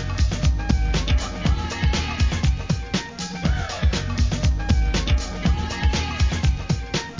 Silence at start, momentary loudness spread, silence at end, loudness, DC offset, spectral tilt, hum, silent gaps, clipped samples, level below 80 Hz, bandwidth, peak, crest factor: 0 s; 3 LU; 0 s; -23 LUFS; under 0.1%; -5 dB/octave; none; none; under 0.1%; -24 dBFS; 7.6 kHz; -6 dBFS; 14 dB